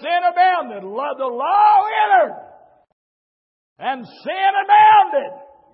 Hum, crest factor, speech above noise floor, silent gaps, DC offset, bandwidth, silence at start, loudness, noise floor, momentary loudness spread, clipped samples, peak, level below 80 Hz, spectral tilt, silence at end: none; 14 dB; over 74 dB; 2.93-3.76 s; under 0.1%; 5.6 kHz; 0 s; -16 LUFS; under -90 dBFS; 16 LU; under 0.1%; -2 dBFS; -82 dBFS; -7.5 dB/octave; 0.3 s